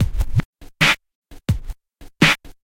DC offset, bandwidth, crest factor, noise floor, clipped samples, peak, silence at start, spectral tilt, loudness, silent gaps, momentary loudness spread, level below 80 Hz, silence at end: under 0.1%; 17 kHz; 20 dB; -42 dBFS; under 0.1%; -2 dBFS; 0 s; -4 dB/octave; -19 LUFS; 0.45-0.53 s, 1.15-1.22 s; 10 LU; -30 dBFS; 0.3 s